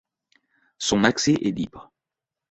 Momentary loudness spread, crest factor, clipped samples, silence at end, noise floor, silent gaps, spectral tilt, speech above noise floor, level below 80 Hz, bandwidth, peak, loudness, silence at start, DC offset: 12 LU; 24 dB; under 0.1%; 0.7 s; -87 dBFS; none; -4 dB/octave; 65 dB; -54 dBFS; 8.4 kHz; -2 dBFS; -23 LUFS; 0.8 s; under 0.1%